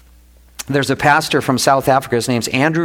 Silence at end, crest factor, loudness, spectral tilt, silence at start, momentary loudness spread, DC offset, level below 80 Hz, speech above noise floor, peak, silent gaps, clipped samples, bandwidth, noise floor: 0 s; 14 dB; -15 LUFS; -4.5 dB/octave; 0.6 s; 6 LU; under 0.1%; -46 dBFS; 31 dB; -2 dBFS; none; under 0.1%; 18 kHz; -46 dBFS